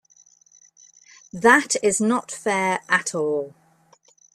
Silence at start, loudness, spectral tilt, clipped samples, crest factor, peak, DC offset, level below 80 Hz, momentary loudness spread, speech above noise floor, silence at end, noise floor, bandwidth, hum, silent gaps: 1.35 s; -20 LUFS; -3 dB/octave; under 0.1%; 22 dB; -2 dBFS; under 0.1%; -66 dBFS; 11 LU; 37 dB; 0.85 s; -58 dBFS; 13.5 kHz; none; none